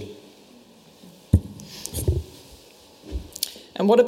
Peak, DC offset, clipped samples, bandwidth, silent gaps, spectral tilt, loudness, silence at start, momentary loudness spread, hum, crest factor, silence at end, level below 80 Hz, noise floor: -2 dBFS; under 0.1%; under 0.1%; 16.5 kHz; none; -6 dB/octave; -27 LUFS; 0 s; 25 LU; none; 24 dB; 0 s; -38 dBFS; -51 dBFS